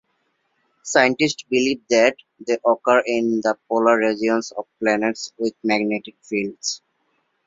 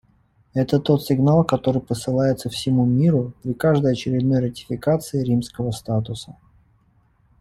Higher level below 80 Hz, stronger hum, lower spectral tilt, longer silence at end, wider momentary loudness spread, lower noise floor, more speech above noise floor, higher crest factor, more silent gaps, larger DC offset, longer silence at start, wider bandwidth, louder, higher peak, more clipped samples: second, -64 dBFS vs -50 dBFS; neither; second, -3.5 dB/octave vs -7.5 dB/octave; second, 0.7 s vs 1.1 s; about the same, 10 LU vs 10 LU; first, -69 dBFS vs -60 dBFS; first, 49 dB vs 40 dB; about the same, 20 dB vs 18 dB; neither; neither; first, 0.85 s vs 0.55 s; second, 7.8 kHz vs 15 kHz; about the same, -20 LUFS vs -21 LUFS; about the same, -2 dBFS vs -4 dBFS; neither